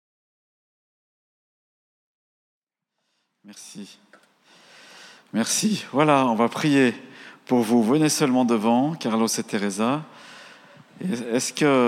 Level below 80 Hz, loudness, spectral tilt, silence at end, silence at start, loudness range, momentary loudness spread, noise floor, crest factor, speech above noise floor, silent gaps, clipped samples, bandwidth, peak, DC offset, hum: -88 dBFS; -22 LUFS; -4.5 dB/octave; 0 s; 3.45 s; 8 LU; 22 LU; -80 dBFS; 20 dB; 59 dB; none; under 0.1%; 15.5 kHz; -4 dBFS; under 0.1%; none